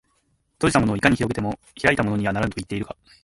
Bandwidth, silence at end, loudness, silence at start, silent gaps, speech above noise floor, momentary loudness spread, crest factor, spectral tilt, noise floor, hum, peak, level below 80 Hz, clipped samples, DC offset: 11.5 kHz; 0.3 s; -22 LUFS; 0.6 s; none; 45 dB; 11 LU; 22 dB; -5.5 dB/octave; -67 dBFS; none; -2 dBFS; -44 dBFS; under 0.1%; under 0.1%